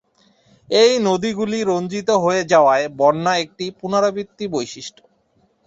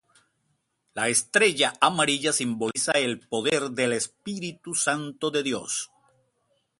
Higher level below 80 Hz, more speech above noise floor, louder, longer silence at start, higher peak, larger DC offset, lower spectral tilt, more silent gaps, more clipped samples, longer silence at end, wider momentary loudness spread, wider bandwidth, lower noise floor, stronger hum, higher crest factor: first, -60 dBFS vs -70 dBFS; second, 44 dB vs 48 dB; first, -18 LUFS vs -25 LUFS; second, 0.7 s vs 0.95 s; about the same, -2 dBFS vs -2 dBFS; neither; first, -4.5 dB/octave vs -2 dB/octave; neither; neither; second, 0.8 s vs 0.95 s; first, 13 LU vs 10 LU; second, 8 kHz vs 11.5 kHz; second, -61 dBFS vs -74 dBFS; neither; second, 18 dB vs 24 dB